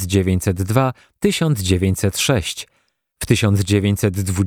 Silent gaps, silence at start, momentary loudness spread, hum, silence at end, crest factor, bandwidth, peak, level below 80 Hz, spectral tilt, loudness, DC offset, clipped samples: none; 0 s; 7 LU; none; 0 s; 18 dB; 18.5 kHz; 0 dBFS; -40 dBFS; -5.5 dB/octave; -18 LUFS; under 0.1%; under 0.1%